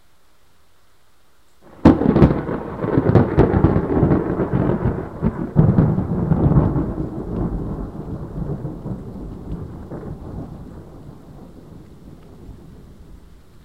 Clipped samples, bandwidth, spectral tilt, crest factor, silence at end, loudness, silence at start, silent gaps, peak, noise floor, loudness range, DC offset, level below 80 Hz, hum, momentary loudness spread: under 0.1%; 5.8 kHz; -10.5 dB/octave; 20 dB; 0.5 s; -19 LUFS; 1.85 s; none; 0 dBFS; -59 dBFS; 19 LU; 0.4%; -32 dBFS; none; 19 LU